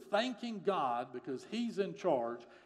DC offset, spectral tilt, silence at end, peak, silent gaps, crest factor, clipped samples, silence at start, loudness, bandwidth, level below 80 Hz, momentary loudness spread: under 0.1%; -5.5 dB/octave; 0.05 s; -18 dBFS; none; 18 dB; under 0.1%; 0 s; -37 LUFS; 12 kHz; -88 dBFS; 8 LU